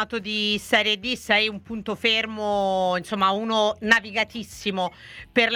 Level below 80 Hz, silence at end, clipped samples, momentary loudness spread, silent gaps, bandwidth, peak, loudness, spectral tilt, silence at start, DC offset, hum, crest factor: -56 dBFS; 0 s; under 0.1%; 9 LU; none; 16.5 kHz; -2 dBFS; -23 LUFS; -3.5 dB/octave; 0 s; under 0.1%; none; 22 dB